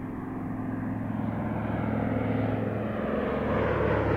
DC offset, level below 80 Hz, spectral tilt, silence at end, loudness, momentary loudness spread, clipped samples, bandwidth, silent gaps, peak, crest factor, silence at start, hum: under 0.1%; -44 dBFS; -9.5 dB/octave; 0 s; -30 LUFS; 7 LU; under 0.1%; 5.4 kHz; none; -14 dBFS; 16 dB; 0 s; none